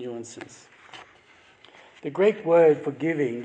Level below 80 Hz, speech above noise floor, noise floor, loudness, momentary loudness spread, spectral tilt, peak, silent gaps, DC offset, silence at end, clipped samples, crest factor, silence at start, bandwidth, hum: -78 dBFS; 32 dB; -56 dBFS; -22 LUFS; 27 LU; -6.5 dB/octave; -8 dBFS; none; under 0.1%; 0 s; under 0.1%; 18 dB; 0 s; 9 kHz; none